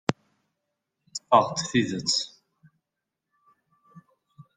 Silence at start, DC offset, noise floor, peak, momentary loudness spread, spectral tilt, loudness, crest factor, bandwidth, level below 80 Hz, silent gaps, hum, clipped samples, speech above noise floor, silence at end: 0.1 s; under 0.1%; -85 dBFS; -2 dBFS; 17 LU; -3.5 dB/octave; -24 LUFS; 28 dB; 10 kHz; -66 dBFS; none; none; under 0.1%; 62 dB; 0.15 s